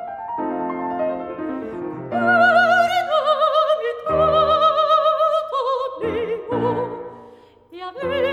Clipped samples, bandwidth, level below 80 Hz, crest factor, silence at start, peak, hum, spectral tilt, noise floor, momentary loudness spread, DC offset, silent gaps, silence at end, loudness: under 0.1%; 14 kHz; -50 dBFS; 16 dB; 0 s; -4 dBFS; none; -5.5 dB/octave; -46 dBFS; 14 LU; under 0.1%; none; 0 s; -19 LUFS